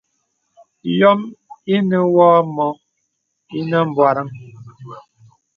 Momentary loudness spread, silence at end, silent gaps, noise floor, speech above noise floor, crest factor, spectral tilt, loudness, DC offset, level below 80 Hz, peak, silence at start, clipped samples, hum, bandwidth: 24 LU; 0.6 s; none; -72 dBFS; 57 dB; 18 dB; -8.5 dB/octave; -16 LUFS; under 0.1%; -66 dBFS; 0 dBFS; 0.85 s; under 0.1%; none; 6.6 kHz